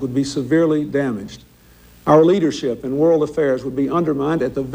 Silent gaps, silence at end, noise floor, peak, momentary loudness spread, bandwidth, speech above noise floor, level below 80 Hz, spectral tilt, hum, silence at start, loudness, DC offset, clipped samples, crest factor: none; 0 s; -47 dBFS; -2 dBFS; 10 LU; 16 kHz; 30 dB; -50 dBFS; -7 dB/octave; none; 0 s; -18 LUFS; under 0.1%; under 0.1%; 16 dB